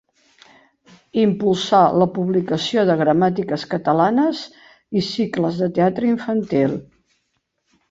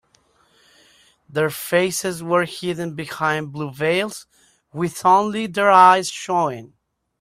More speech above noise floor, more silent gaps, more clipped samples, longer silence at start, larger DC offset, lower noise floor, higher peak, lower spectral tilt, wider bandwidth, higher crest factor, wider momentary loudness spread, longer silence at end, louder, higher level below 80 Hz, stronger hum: first, 53 dB vs 41 dB; neither; neither; second, 1.15 s vs 1.3 s; neither; first, -71 dBFS vs -60 dBFS; about the same, -2 dBFS vs 0 dBFS; first, -6.5 dB/octave vs -4 dB/octave; second, 7.8 kHz vs 16 kHz; about the same, 18 dB vs 20 dB; second, 8 LU vs 16 LU; first, 1.05 s vs 0.55 s; about the same, -19 LUFS vs -19 LUFS; first, -58 dBFS vs -64 dBFS; neither